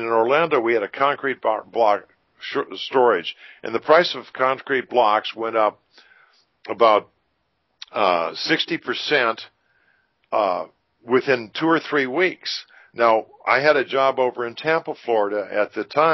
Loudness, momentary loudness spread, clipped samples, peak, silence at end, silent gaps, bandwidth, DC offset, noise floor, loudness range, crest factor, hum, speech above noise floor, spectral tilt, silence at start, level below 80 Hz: -21 LUFS; 11 LU; under 0.1%; -2 dBFS; 0 s; none; 6.2 kHz; under 0.1%; -71 dBFS; 3 LU; 20 dB; none; 50 dB; -5 dB/octave; 0 s; -74 dBFS